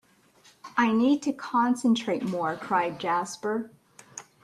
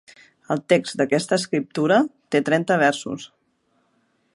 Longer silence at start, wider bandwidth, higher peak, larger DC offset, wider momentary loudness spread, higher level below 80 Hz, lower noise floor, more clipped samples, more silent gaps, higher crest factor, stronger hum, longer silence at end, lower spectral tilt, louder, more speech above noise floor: first, 0.65 s vs 0.5 s; about the same, 12.5 kHz vs 11.5 kHz; second, -10 dBFS vs -4 dBFS; neither; first, 15 LU vs 10 LU; about the same, -72 dBFS vs -70 dBFS; second, -59 dBFS vs -67 dBFS; neither; neither; about the same, 18 dB vs 18 dB; neither; second, 0.2 s vs 1.1 s; about the same, -5 dB/octave vs -5 dB/octave; second, -26 LUFS vs -21 LUFS; second, 33 dB vs 46 dB